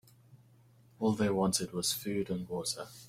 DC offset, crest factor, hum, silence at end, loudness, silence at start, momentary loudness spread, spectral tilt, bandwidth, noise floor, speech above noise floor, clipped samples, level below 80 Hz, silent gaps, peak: under 0.1%; 18 dB; none; 0 s; -33 LUFS; 0.35 s; 6 LU; -4 dB/octave; 16.5 kHz; -62 dBFS; 29 dB; under 0.1%; -64 dBFS; none; -16 dBFS